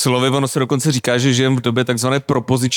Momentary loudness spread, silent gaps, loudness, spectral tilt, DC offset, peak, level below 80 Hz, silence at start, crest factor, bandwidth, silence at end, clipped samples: 3 LU; none; -16 LUFS; -5 dB/octave; under 0.1%; -4 dBFS; -56 dBFS; 0 s; 12 dB; 18.5 kHz; 0 s; under 0.1%